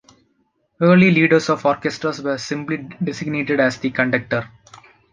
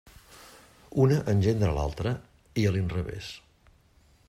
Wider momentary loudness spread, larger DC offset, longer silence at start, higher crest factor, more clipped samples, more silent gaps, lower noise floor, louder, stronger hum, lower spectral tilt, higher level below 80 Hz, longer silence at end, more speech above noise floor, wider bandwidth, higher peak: second, 12 LU vs 16 LU; neither; first, 0.8 s vs 0.3 s; about the same, 18 dB vs 18 dB; neither; neither; first, -66 dBFS vs -61 dBFS; first, -18 LUFS vs -28 LUFS; neither; about the same, -6.5 dB/octave vs -7.5 dB/octave; second, -58 dBFS vs -44 dBFS; second, 0.65 s vs 0.9 s; first, 48 dB vs 35 dB; second, 9.2 kHz vs 14.5 kHz; first, -2 dBFS vs -10 dBFS